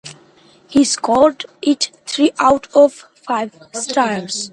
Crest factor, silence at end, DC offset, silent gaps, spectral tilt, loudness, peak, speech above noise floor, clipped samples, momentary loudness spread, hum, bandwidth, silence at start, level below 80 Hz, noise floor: 16 dB; 0 s; under 0.1%; none; -3 dB/octave; -16 LUFS; 0 dBFS; 33 dB; under 0.1%; 10 LU; none; 11.5 kHz; 0.05 s; -54 dBFS; -49 dBFS